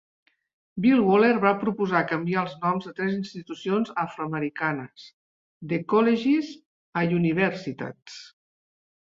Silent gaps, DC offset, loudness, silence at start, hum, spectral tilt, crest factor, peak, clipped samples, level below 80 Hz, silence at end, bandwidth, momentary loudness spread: 5.13-5.61 s, 6.66-6.93 s; under 0.1%; -24 LUFS; 0.75 s; none; -7.5 dB/octave; 22 dB; -4 dBFS; under 0.1%; -68 dBFS; 0.9 s; 7.6 kHz; 16 LU